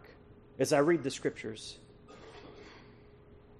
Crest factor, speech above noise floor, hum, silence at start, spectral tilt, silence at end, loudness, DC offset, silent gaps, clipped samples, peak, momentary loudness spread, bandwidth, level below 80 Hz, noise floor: 20 dB; 26 dB; none; 0.1 s; -5 dB/octave; 0.7 s; -32 LUFS; under 0.1%; none; under 0.1%; -16 dBFS; 26 LU; 11.5 kHz; -64 dBFS; -57 dBFS